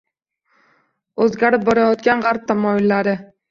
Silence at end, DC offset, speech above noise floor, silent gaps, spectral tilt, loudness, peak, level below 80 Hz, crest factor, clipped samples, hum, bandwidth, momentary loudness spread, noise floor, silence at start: 0.25 s; under 0.1%; 52 dB; none; -7 dB/octave; -17 LUFS; -2 dBFS; -58 dBFS; 16 dB; under 0.1%; none; 7.4 kHz; 6 LU; -68 dBFS; 1.15 s